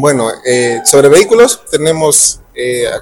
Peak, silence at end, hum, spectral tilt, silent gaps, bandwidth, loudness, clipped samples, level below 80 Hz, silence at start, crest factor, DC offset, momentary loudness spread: 0 dBFS; 0 s; none; -3 dB/octave; none; 19 kHz; -9 LUFS; 1%; -44 dBFS; 0 s; 10 dB; under 0.1%; 9 LU